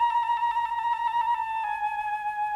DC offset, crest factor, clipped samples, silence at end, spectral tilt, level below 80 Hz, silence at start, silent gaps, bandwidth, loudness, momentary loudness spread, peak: under 0.1%; 10 dB; under 0.1%; 0 s; -0.5 dB/octave; -62 dBFS; 0 s; none; 11 kHz; -27 LUFS; 4 LU; -16 dBFS